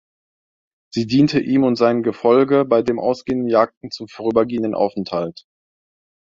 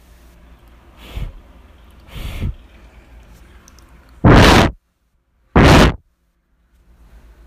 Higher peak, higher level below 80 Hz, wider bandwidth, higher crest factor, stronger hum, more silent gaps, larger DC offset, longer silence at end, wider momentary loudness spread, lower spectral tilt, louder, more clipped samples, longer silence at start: about the same, -2 dBFS vs 0 dBFS; second, -56 dBFS vs -24 dBFS; second, 7.6 kHz vs 16 kHz; about the same, 16 dB vs 18 dB; neither; first, 3.77-3.81 s vs none; neither; second, 1 s vs 1.5 s; second, 10 LU vs 25 LU; first, -7 dB/octave vs -5.5 dB/octave; second, -18 LUFS vs -11 LUFS; neither; second, 0.95 s vs 1.15 s